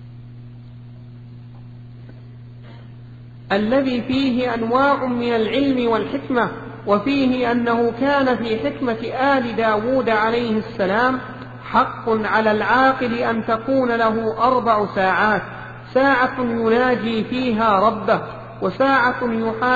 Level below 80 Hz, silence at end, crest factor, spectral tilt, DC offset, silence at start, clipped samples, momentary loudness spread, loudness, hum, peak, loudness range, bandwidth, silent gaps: -48 dBFS; 0 s; 16 dB; -7 dB/octave; under 0.1%; 0 s; under 0.1%; 23 LU; -19 LUFS; none; -2 dBFS; 4 LU; 7.6 kHz; none